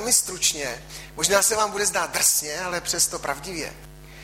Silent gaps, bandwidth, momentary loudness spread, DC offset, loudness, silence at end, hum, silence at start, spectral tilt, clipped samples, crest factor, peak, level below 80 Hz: none; 16.5 kHz; 13 LU; under 0.1%; -22 LUFS; 0 s; none; 0 s; -0.5 dB/octave; under 0.1%; 20 dB; -4 dBFS; -48 dBFS